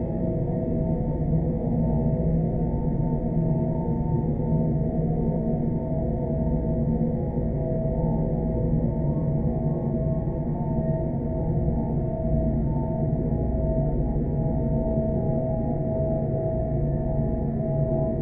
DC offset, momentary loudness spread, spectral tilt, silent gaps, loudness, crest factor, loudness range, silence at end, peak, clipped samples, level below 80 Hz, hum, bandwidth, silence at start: under 0.1%; 2 LU; -14.5 dB/octave; none; -26 LUFS; 12 dB; 1 LU; 0 s; -12 dBFS; under 0.1%; -32 dBFS; none; 2.4 kHz; 0 s